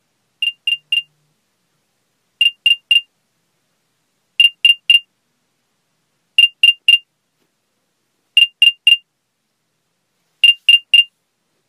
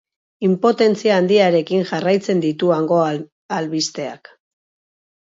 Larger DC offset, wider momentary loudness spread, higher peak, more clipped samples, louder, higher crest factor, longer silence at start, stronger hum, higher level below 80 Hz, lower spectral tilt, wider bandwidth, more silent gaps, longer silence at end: neither; about the same, 10 LU vs 11 LU; about the same, 0 dBFS vs -2 dBFS; neither; first, -11 LUFS vs -17 LUFS; about the same, 18 dB vs 16 dB; about the same, 0.4 s vs 0.4 s; neither; second, -86 dBFS vs -68 dBFS; second, 6 dB/octave vs -5.5 dB/octave; first, 15 kHz vs 7.8 kHz; second, none vs 3.32-3.49 s; second, 0.65 s vs 1.05 s